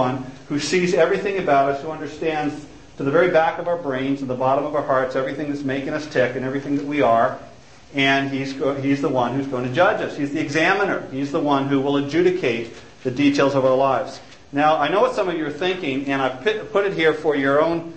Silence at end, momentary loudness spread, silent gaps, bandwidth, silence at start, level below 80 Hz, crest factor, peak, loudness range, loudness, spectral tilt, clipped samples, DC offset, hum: 0 s; 8 LU; none; 8.8 kHz; 0 s; -56 dBFS; 16 dB; -4 dBFS; 2 LU; -21 LUFS; -5.5 dB/octave; under 0.1%; 0.4%; none